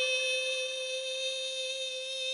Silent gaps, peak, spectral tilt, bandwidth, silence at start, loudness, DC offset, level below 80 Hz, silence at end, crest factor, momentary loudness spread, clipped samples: none; -18 dBFS; 4 dB/octave; 11.5 kHz; 0 s; -32 LUFS; under 0.1%; -84 dBFS; 0 s; 14 dB; 5 LU; under 0.1%